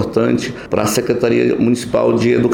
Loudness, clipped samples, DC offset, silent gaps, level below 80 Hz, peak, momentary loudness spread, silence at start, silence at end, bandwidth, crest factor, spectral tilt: -15 LUFS; under 0.1%; under 0.1%; none; -46 dBFS; -2 dBFS; 4 LU; 0 s; 0 s; 18 kHz; 12 dB; -5.5 dB/octave